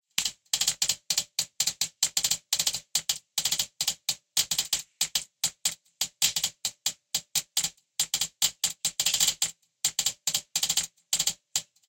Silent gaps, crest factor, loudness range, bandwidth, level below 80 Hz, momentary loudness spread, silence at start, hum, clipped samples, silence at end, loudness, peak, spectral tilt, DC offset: none; 24 dB; 2 LU; 17 kHz; -66 dBFS; 6 LU; 0.2 s; none; under 0.1%; 0.25 s; -27 LUFS; -6 dBFS; 2 dB/octave; under 0.1%